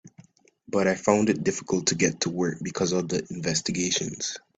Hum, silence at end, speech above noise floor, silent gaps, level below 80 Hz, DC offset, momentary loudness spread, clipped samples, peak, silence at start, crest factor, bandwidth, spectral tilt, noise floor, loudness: none; 0.2 s; 29 dB; none; -60 dBFS; under 0.1%; 7 LU; under 0.1%; -6 dBFS; 0.05 s; 20 dB; 9.4 kHz; -4 dB/octave; -55 dBFS; -26 LUFS